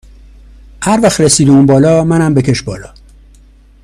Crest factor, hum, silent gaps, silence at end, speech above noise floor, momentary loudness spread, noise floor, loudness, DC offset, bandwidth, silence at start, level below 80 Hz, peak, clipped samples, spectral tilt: 12 dB; 50 Hz at -30 dBFS; none; 0.95 s; 32 dB; 12 LU; -41 dBFS; -9 LUFS; under 0.1%; 14 kHz; 0.8 s; -36 dBFS; 0 dBFS; under 0.1%; -5.5 dB/octave